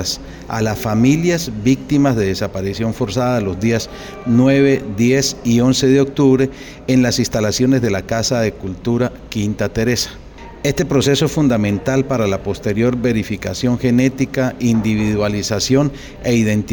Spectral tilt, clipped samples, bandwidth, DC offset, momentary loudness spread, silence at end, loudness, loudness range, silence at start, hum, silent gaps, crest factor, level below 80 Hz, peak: -5.5 dB/octave; under 0.1%; over 20 kHz; under 0.1%; 8 LU; 0 s; -16 LUFS; 3 LU; 0 s; none; none; 14 dB; -38 dBFS; -2 dBFS